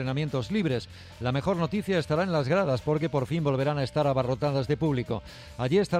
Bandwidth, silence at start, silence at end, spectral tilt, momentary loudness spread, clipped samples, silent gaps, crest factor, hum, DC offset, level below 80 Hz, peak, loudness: 13 kHz; 0 s; 0 s; -7 dB/octave; 8 LU; under 0.1%; none; 14 dB; none; under 0.1%; -52 dBFS; -12 dBFS; -28 LUFS